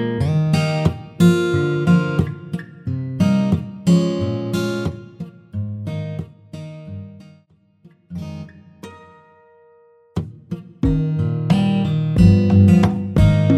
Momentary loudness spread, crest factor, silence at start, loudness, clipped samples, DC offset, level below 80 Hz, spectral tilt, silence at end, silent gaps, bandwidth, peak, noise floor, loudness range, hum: 22 LU; 18 dB; 0 s; -18 LUFS; under 0.1%; under 0.1%; -34 dBFS; -8 dB/octave; 0 s; none; 13 kHz; -2 dBFS; -55 dBFS; 19 LU; none